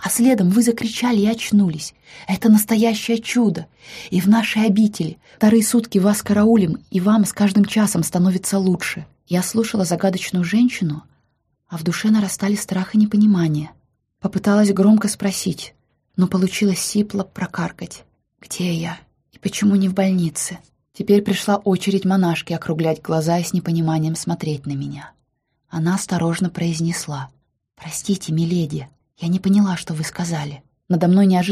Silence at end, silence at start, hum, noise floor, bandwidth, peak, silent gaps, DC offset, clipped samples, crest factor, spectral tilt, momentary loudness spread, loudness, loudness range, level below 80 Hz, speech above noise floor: 0 s; 0 s; none; -70 dBFS; 15.5 kHz; -4 dBFS; none; under 0.1%; under 0.1%; 16 dB; -5.5 dB/octave; 14 LU; -19 LUFS; 6 LU; -56 dBFS; 52 dB